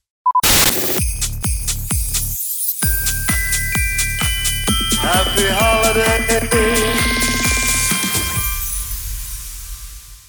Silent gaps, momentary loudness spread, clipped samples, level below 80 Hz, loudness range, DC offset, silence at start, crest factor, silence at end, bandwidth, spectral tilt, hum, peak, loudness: none; 11 LU; under 0.1%; -26 dBFS; 3 LU; under 0.1%; 0.25 s; 16 dB; 0.1 s; over 20 kHz; -2.5 dB/octave; none; -2 dBFS; -16 LUFS